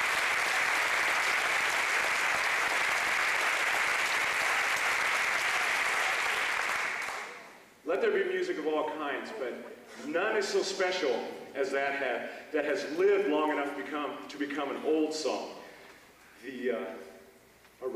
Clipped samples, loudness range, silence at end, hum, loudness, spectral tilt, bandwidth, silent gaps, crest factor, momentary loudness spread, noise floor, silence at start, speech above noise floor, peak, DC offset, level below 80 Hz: under 0.1%; 7 LU; 0 s; none; -29 LUFS; -1.5 dB/octave; 15 kHz; none; 14 dB; 12 LU; -59 dBFS; 0 s; 27 dB; -16 dBFS; under 0.1%; -70 dBFS